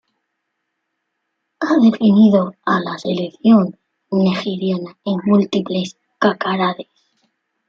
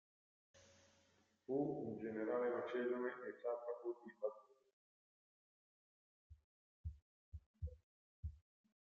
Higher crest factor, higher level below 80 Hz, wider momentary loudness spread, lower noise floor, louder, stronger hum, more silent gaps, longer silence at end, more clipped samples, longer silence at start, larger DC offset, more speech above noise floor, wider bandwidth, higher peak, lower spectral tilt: about the same, 16 dB vs 20 dB; about the same, -62 dBFS vs -66 dBFS; second, 11 LU vs 16 LU; about the same, -74 dBFS vs -77 dBFS; first, -17 LUFS vs -46 LUFS; neither; second, none vs 4.73-6.30 s, 6.44-6.84 s, 7.02-7.32 s, 7.46-7.54 s, 7.83-8.23 s; first, 0.85 s vs 0.6 s; neither; first, 1.6 s vs 0.55 s; neither; first, 59 dB vs 34 dB; about the same, 7.2 kHz vs 7.2 kHz; first, -2 dBFS vs -30 dBFS; about the same, -7.5 dB/octave vs -6.5 dB/octave